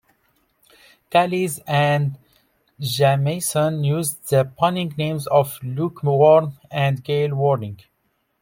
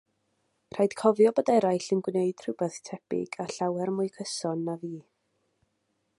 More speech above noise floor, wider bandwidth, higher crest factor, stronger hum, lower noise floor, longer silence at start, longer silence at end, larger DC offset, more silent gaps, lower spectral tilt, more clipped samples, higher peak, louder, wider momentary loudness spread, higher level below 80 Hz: about the same, 50 dB vs 49 dB; first, 16.5 kHz vs 11.5 kHz; about the same, 18 dB vs 20 dB; neither; second, -69 dBFS vs -76 dBFS; first, 1.1 s vs 0.75 s; second, 0.65 s vs 1.2 s; neither; neither; about the same, -5.5 dB/octave vs -5.5 dB/octave; neither; first, -2 dBFS vs -8 dBFS; first, -20 LUFS vs -28 LUFS; second, 9 LU vs 14 LU; first, -60 dBFS vs -76 dBFS